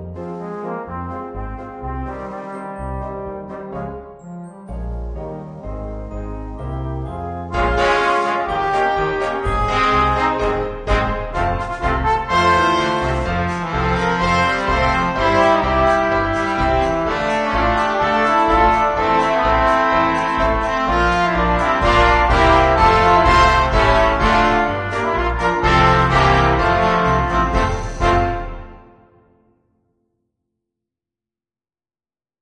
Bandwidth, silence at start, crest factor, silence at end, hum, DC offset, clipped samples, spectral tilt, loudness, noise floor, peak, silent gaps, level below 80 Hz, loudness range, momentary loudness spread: 10 kHz; 0 s; 18 dB; 3.65 s; none; under 0.1%; under 0.1%; -5.5 dB/octave; -16 LUFS; under -90 dBFS; 0 dBFS; none; -28 dBFS; 15 LU; 16 LU